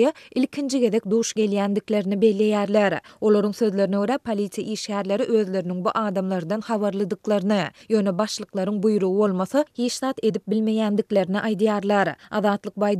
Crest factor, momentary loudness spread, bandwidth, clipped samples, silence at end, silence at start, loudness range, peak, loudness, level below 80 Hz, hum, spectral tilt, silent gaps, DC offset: 16 dB; 6 LU; 13 kHz; under 0.1%; 0 s; 0 s; 3 LU; -6 dBFS; -23 LUFS; -68 dBFS; none; -5.5 dB/octave; none; under 0.1%